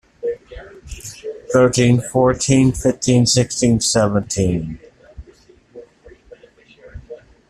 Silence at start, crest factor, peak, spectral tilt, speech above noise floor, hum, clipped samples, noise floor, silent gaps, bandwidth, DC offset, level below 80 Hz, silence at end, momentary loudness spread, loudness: 0.25 s; 16 dB; -2 dBFS; -5 dB/octave; 34 dB; none; under 0.1%; -49 dBFS; none; 13.5 kHz; under 0.1%; -40 dBFS; 0.35 s; 23 LU; -16 LUFS